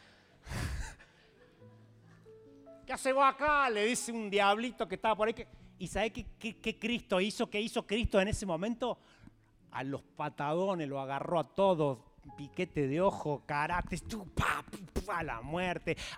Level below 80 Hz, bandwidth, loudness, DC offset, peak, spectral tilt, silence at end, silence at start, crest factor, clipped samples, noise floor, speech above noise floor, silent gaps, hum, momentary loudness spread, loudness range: -52 dBFS; 16 kHz; -34 LUFS; under 0.1%; -14 dBFS; -4.5 dB/octave; 0 s; 0.45 s; 20 dB; under 0.1%; -62 dBFS; 29 dB; none; none; 14 LU; 5 LU